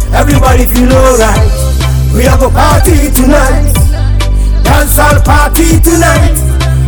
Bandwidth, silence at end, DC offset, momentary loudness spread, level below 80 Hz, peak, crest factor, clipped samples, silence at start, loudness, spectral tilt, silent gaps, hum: over 20 kHz; 0 s; under 0.1%; 4 LU; -8 dBFS; 0 dBFS; 6 dB; 7%; 0 s; -7 LUFS; -5 dB/octave; none; none